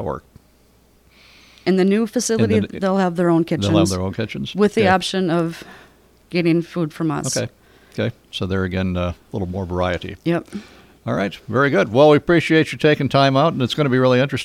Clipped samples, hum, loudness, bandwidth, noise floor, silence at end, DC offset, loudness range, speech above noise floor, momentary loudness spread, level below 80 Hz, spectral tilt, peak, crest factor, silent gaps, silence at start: under 0.1%; none; -19 LUFS; 15 kHz; -54 dBFS; 0 s; under 0.1%; 7 LU; 36 dB; 11 LU; -48 dBFS; -5.5 dB/octave; -2 dBFS; 18 dB; none; 0 s